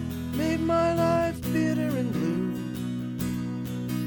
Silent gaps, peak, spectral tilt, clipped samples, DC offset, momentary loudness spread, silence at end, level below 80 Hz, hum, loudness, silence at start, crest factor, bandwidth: none; -14 dBFS; -7 dB/octave; under 0.1%; under 0.1%; 8 LU; 0 s; -48 dBFS; none; -27 LUFS; 0 s; 14 dB; over 20 kHz